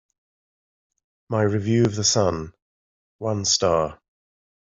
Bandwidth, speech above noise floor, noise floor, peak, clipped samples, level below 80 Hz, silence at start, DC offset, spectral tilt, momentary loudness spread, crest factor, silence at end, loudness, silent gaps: 8 kHz; over 69 dB; under -90 dBFS; -6 dBFS; under 0.1%; -54 dBFS; 1.3 s; under 0.1%; -4 dB/octave; 12 LU; 20 dB; 0.75 s; -22 LUFS; 2.62-3.19 s